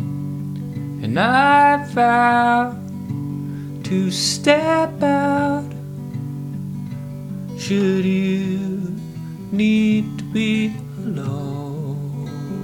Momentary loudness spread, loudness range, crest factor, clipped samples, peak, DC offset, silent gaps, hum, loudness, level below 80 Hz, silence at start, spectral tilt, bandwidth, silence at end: 15 LU; 6 LU; 18 dB; under 0.1%; -2 dBFS; under 0.1%; none; none; -20 LUFS; -54 dBFS; 0 s; -5.5 dB/octave; 17 kHz; 0 s